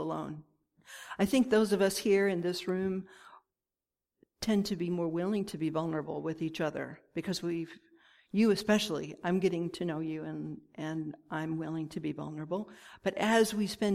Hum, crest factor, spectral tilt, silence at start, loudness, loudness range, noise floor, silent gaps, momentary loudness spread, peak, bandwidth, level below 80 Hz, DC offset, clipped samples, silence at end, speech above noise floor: none; 18 dB; -5.5 dB/octave; 0 s; -32 LUFS; 5 LU; under -90 dBFS; none; 13 LU; -14 dBFS; 15.5 kHz; -66 dBFS; under 0.1%; under 0.1%; 0 s; over 58 dB